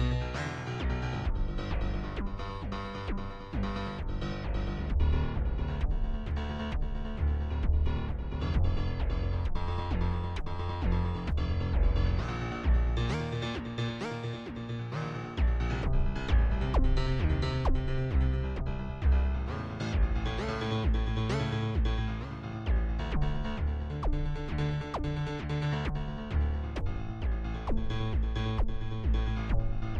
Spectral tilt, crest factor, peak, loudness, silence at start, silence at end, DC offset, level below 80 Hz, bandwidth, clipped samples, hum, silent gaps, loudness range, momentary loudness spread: -7.5 dB/octave; 14 dB; -14 dBFS; -33 LUFS; 0 s; 0 s; under 0.1%; -32 dBFS; 7.8 kHz; under 0.1%; none; none; 3 LU; 7 LU